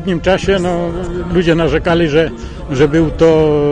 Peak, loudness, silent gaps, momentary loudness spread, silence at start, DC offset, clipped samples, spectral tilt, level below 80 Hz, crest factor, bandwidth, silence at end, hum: 0 dBFS; -13 LUFS; none; 9 LU; 0 s; under 0.1%; under 0.1%; -6.5 dB/octave; -28 dBFS; 12 dB; 10 kHz; 0 s; none